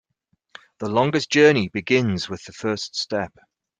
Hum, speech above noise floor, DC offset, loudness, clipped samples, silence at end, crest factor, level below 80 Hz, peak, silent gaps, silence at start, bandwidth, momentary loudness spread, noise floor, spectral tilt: none; 50 dB; under 0.1%; -21 LUFS; under 0.1%; 0.55 s; 20 dB; -62 dBFS; -2 dBFS; none; 0.8 s; 9.4 kHz; 14 LU; -71 dBFS; -5 dB/octave